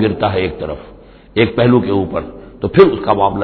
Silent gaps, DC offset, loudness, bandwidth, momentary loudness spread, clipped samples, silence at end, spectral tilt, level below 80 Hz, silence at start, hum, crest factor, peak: none; under 0.1%; -14 LUFS; 5.4 kHz; 15 LU; 0.2%; 0 s; -10 dB/octave; -38 dBFS; 0 s; none; 14 dB; 0 dBFS